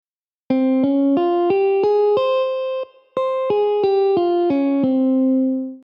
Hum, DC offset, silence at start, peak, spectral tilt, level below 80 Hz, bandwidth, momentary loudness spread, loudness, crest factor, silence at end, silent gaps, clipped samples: none; under 0.1%; 0.5 s; -6 dBFS; -8.5 dB/octave; -68 dBFS; 5.6 kHz; 6 LU; -18 LUFS; 12 dB; 0.1 s; none; under 0.1%